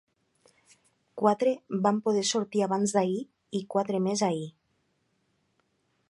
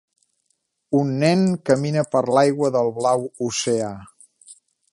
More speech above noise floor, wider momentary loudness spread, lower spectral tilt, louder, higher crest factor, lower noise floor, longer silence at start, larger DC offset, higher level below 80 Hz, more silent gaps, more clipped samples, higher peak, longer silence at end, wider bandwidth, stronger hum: second, 47 dB vs 52 dB; first, 10 LU vs 7 LU; about the same, -5 dB/octave vs -5.5 dB/octave; second, -28 LUFS vs -20 LUFS; about the same, 22 dB vs 18 dB; about the same, -74 dBFS vs -71 dBFS; first, 1.15 s vs 0.9 s; neither; second, -76 dBFS vs -62 dBFS; neither; neither; second, -8 dBFS vs -2 dBFS; first, 1.6 s vs 0.4 s; about the same, 11.5 kHz vs 11.5 kHz; neither